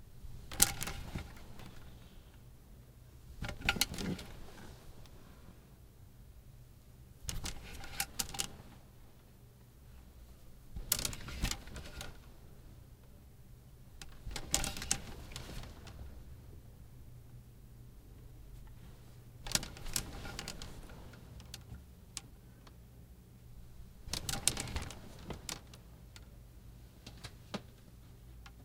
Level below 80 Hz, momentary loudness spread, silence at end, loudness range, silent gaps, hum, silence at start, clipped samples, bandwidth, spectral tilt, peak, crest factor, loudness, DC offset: -52 dBFS; 23 LU; 0 s; 11 LU; none; none; 0 s; under 0.1%; 17.5 kHz; -2 dB/octave; 0 dBFS; 44 dB; -39 LUFS; under 0.1%